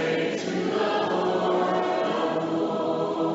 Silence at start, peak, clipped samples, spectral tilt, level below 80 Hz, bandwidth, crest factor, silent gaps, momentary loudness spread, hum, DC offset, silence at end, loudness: 0 s; -12 dBFS; under 0.1%; -4 dB/octave; -70 dBFS; 8 kHz; 12 dB; none; 3 LU; none; under 0.1%; 0 s; -25 LUFS